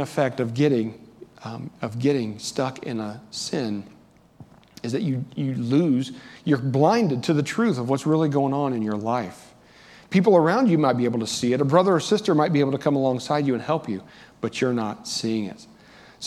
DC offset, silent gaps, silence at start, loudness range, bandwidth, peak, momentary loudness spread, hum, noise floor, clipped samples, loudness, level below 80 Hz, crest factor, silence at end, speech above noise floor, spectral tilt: under 0.1%; none; 0 s; 8 LU; 13.5 kHz; -2 dBFS; 13 LU; none; -50 dBFS; under 0.1%; -23 LUFS; -66 dBFS; 20 dB; 0 s; 27 dB; -6 dB/octave